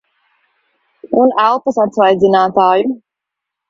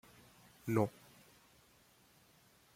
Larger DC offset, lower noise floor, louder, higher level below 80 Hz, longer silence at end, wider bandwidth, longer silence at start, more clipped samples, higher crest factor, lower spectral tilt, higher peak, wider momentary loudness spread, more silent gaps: neither; first, -81 dBFS vs -68 dBFS; first, -12 LUFS vs -38 LUFS; first, -58 dBFS vs -76 dBFS; second, 0.75 s vs 1.85 s; second, 7.6 kHz vs 16.5 kHz; first, 1.05 s vs 0.65 s; neither; second, 14 dB vs 26 dB; about the same, -6.5 dB/octave vs -7.5 dB/octave; first, 0 dBFS vs -18 dBFS; second, 7 LU vs 27 LU; neither